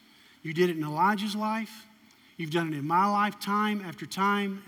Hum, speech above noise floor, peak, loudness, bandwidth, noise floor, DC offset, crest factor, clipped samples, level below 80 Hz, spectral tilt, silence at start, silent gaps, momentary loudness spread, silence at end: none; 30 dB; -14 dBFS; -28 LUFS; 17 kHz; -58 dBFS; under 0.1%; 16 dB; under 0.1%; -82 dBFS; -5.5 dB/octave; 0.45 s; none; 10 LU; 0.05 s